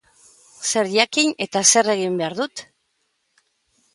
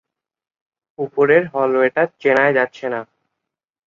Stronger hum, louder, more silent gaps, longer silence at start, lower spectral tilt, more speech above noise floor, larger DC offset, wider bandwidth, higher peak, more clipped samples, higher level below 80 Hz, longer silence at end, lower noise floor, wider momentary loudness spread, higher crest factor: neither; about the same, -19 LUFS vs -17 LUFS; neither; second, 0.6 s vs 1 s; second, -2 dB/octave vs -7 dB/octave; second, 51 dB vs 64 dB; neither; first, 11.5 kHz vs 7.2 kHz; about the same, -2 dBFS vs -2 dBFS; neither; second, -70 dBFS vs -64 dBFS; first, 1.3 s vs 0.85 s; second, -70 dBFS vs -81 dBFS; about the same, 13 LU vs 11 LU; about the same, 22 dB vs 18 dB